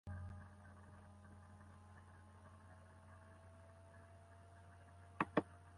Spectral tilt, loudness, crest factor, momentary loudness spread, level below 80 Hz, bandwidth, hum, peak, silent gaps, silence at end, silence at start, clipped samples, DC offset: -7 dB/octave; -48 LUFS; 32 dB; 20 LU; -66 dBFS; 11 kHz; none; -20 dBFS; none; 0 s; 0.05 s; under 0.1%; under 0.1%